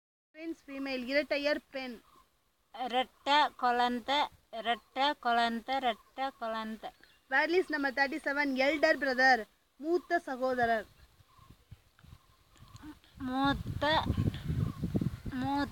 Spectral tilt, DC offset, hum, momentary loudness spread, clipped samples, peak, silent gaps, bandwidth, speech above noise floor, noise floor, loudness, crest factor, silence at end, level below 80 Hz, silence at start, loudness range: -5.5 dB/octave; under 0.1%; none; 15 LU; under 0.1%; -14 dBFS; none; 17 kHz; 42 dB; -74 dBFS; -31 LUFS; 18 dB; 0 s; -54 dBFS; 0.35 s; 7 LU